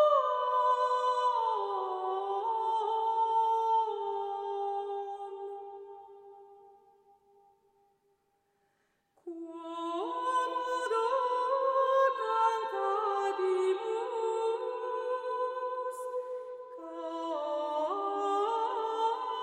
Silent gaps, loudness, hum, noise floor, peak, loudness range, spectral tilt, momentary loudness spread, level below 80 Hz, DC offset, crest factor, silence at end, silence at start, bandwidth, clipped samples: none; -32 LUFS; none; -76 dBFS; -16 dBFS; 13 LU; -2 dB/octave; 14 LU; -86 dBFS; under 0.1%; 16 dB; 0 s; 0 s; 12 kHz; under 0.1%